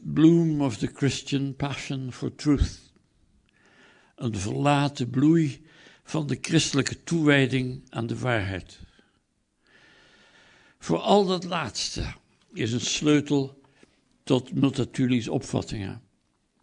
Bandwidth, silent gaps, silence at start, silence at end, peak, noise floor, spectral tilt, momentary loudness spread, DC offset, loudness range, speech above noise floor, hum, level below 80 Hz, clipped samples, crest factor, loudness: 10.5 kHz; none; 0 s; 0.65 s; -6 dBFS; -71 dBFS; -5.5 dB/octave; 13 LU; under 0.1%; 6 LU; 46 dB; none; -46 dBFS; under 0.1%; 20 dB; -25 LUFS